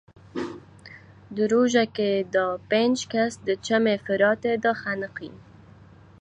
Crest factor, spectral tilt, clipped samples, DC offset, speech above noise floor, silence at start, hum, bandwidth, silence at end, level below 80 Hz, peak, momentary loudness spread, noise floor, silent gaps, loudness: 18 dB; -4.5 dB/octave; under 0.1%; under 0.1%; 26 dB; 0.35 s; none; 10.5 kHz; 0.85 s; -62 dBFS; -6 dBFS; 15 LU; -50 dBFS; none; -24 LUFS